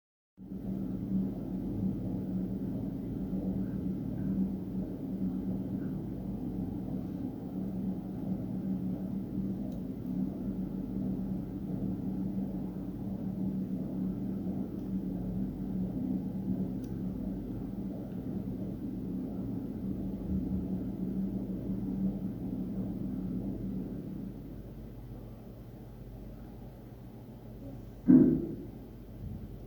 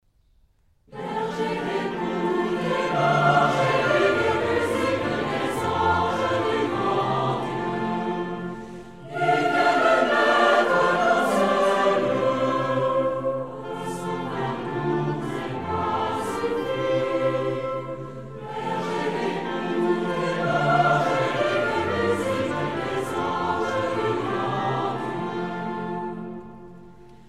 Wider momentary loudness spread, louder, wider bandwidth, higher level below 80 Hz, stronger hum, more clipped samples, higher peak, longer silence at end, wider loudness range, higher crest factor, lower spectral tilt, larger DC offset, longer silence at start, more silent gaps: about the same, 12 LU vs 12 LU; second, -35 LUFS vs -24 LUFS; first, over 20 kHz vs 15 kHz; first, -50 dBFS vs -56 dBFS; neither; neither; second, -10 dBFS vs -6 dBFS; second, 0 s vs 0.15 s; about the same, 7 LU vs 7 LU; first, 26 dB vs 16 dB; first, -10.5 dB/octave vs -6 dB/octave; second, under 0.1% vs 0.3%; second, 0.4 s vs 0.9 s; neither